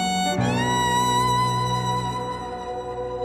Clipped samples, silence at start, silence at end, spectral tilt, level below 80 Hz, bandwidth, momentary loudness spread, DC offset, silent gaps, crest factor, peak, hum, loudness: under 0.1%; 0 s; 0 s; -4.5 dB/octave; -44 dBFS; 15 kHz; 11 LU; under 0.1%; none; 14 dB; -10 dBFS; none; -23 LUFS